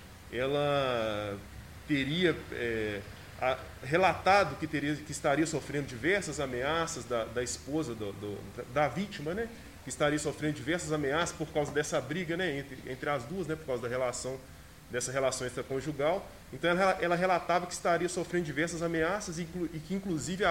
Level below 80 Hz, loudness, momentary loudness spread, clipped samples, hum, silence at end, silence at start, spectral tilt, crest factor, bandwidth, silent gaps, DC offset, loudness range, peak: -54 dBFS; -32 LUFS; 11 LU; under 0.1%; none; 0 s; 0 s; -4.5 dB/octave; 20 dB; 16 kHz; none; under 0.1%; 4 LU; -12 dBFS